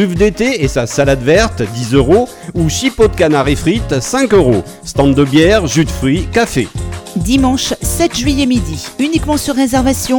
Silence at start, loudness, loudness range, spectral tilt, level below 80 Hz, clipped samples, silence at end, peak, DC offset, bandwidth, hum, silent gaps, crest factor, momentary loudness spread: 0 s; -12 LUFS; 3 LU; -5 dB/octave; -26 dBFS; under 0.1%; 0 s; 0 dBFS; under 0.1%; 19.5 kHz; none; none; 12 dB; 7 LU